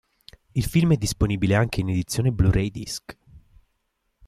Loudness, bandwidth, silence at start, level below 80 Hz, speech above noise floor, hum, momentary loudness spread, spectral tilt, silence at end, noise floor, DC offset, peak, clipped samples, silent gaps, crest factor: -23 LUFS; 15 kHz; 0.55 s; -38 dBFS; 52 dB; none; 10 LU; -6 dB/octave; 0.9 s; -74 dBFS; under 0.1%; -8 dBFS; under 0.1%; none; 16 dB